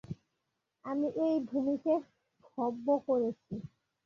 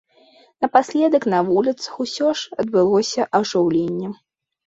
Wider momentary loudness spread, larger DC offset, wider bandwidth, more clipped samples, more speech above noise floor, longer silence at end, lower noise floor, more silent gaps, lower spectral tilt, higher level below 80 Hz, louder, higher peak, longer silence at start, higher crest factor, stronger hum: first, 17 LU vs 9 LU; neither; second, 6.8 kHz vs 8 kHz; neither; first, 52 dB vs 35 dB; second, 0.4 s vs 0.55 s; first, -84 dBFS vs -53 dBFS; neither; first, -9 dB/octave vs -5 dB/octave; second, -72 dBFS vs -62 dBFS; second, -33 LUFS vs -19 LUFS; second, -18 dBFS vs -2 dBFS; second, 0.1 s vs 0.6 s; about the same, 16 dB vs 18 dB; neither